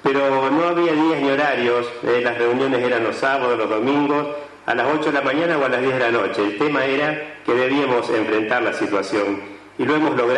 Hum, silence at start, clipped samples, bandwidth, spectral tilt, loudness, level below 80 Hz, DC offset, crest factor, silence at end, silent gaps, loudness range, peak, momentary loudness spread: none; 0.05 s; under 0.1%; 10.5 kHz; -5.5 dB/octave; -19 LUFS; -64 dBFS; under 0.1%; 14 dB; 0 s; none; 1 LU; -6 dBFS; 4 LU